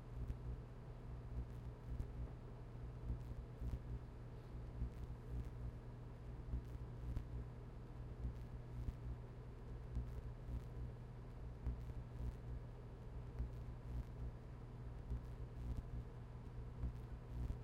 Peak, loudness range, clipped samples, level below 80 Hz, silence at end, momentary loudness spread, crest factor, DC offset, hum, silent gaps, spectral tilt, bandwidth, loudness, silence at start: -34 dBFS; 1 LU; under 0.1%; -50 dBFS; 0 s; 5 LU; 16 dB; under 0.1%; 60 Hz at -50 dBFS; none; -8.5 dB/octave; 8.4 kHz; -52 LUFS; 0 s